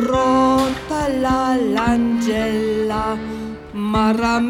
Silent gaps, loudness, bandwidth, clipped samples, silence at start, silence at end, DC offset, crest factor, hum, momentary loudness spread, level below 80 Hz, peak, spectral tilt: none; -18 LUFS; 16.5 kHz; under 0.1%; 0 s; 0 s; under 0.1%; 12 dB; none; 11 LU; -38 dBFS; -4 dBFS; -5.5 dB/octave